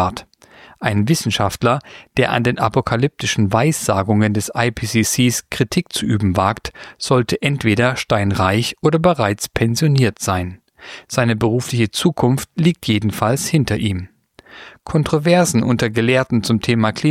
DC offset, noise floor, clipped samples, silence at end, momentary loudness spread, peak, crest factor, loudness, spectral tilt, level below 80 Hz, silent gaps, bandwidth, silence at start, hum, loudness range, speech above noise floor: under 0.1%; -45 dBFS; under 0.1%; 0 s; 7 LU; -2 dBFS; 16 dB; -17 LUFS; -5 dB/octave; -44 dBFS; none; 16 kHz; 0 s; none; 2 LU; 28 dB